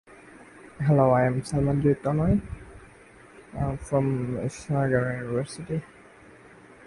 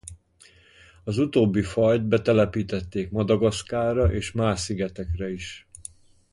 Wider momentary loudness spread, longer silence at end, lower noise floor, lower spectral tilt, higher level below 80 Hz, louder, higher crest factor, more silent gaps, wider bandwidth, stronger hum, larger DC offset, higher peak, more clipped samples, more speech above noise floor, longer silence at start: second, 12 LU vs 17 LU; first, 1 s vs 0.5 s; second, -51 dBFS vs -56 dBFS; first, -8 dB/octave vs -6.5 dB/octave; second, -46 dBFS vs -40 dBFS; about the same, -26 LUFS vs -24 LUFS; about the same, 20 dB vs 18 dB; neither; about the same, 11.5 kHz vs 11.5 kHz; neither; neither; about the same, -8 dBFS vs -6 dBFS; neither; second, 27 dB vs 32 dB; first, 0.35 s vs 0.05 s